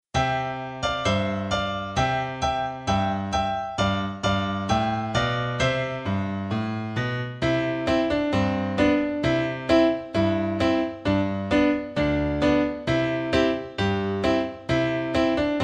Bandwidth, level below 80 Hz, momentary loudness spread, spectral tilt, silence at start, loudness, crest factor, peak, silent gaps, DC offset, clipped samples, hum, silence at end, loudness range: 10 kHz; -42 dBFS; 6 LU; -6 dB/octave; 0.15 s; -24 LUFS; 16 dB; -8 dBFS; none; under 0.1%; under 0.1%; none; 0 s; 3 LU